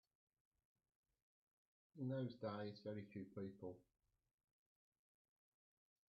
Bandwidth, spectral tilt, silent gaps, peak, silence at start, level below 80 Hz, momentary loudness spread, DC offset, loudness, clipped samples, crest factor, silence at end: 5.4 kHz; -7 dB/octave; none; -36 dBFS; 1.95 s; -90 dBFS; 10 LU; under 0.1%; -51 LUFS; under 0.1%; 20 dB; 2.3 s